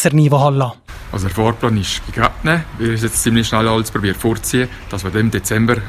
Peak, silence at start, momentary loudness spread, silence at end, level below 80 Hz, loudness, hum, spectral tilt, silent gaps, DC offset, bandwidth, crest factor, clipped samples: 0 dBFS; 0 s; 9 LU; 0 s; -32 dBFS; -16 LUFS; none; -5 dB/octave; none; under 0.1%; 15.5 kHz; 16 dB; under 0.1%